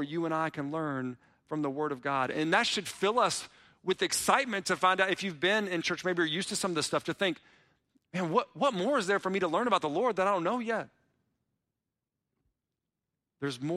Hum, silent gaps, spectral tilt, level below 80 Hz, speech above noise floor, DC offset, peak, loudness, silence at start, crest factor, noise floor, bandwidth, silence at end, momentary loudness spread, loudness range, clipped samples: none; none; -3.5 dB/octave; -72 dBFS; 58 dB; under 0.1%; -12 dBFS; -30 LUFS; 0 s; 20 dB; -88 dBFS; 15.5 kHz; 0 s; 9 LU; 4 LU; under 0.1%